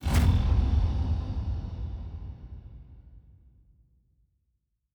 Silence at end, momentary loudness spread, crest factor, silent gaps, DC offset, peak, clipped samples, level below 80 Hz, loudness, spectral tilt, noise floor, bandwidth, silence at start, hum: 1.75 s; 22 LU; 18 dB; none; under 0.1%; -12 dBFS; under 0.1%; -32 dBFS; -29 LUFS; -7 dB/octave; -77 dBFS; over 20 kHz; 0 s; none